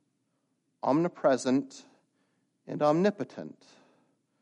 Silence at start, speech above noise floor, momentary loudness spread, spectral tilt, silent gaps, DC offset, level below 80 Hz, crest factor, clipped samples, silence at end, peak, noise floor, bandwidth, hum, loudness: 0.85 s; 49 dB; 18 LU; -6.5 dB/octave; none; under 0.1%; -82 dBFS; 18 dB; under 0.1%; 0.9 s; -12 dBFS; -77 dBFS; 10.5 kHz; none; -28 LUFS